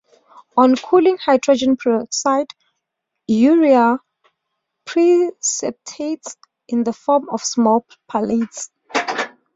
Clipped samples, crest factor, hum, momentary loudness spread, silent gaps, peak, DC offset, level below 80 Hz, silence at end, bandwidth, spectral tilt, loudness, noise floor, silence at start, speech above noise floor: under 0.1%; 16 dB; none; 13 LU; none; -2 dBFS; under 0.1%; -62 dBFS; 0.25 s; 8 kHz; -3.5 dB/octave; -17 LUFS; -78 dBFS; 0.55 s; 62 dB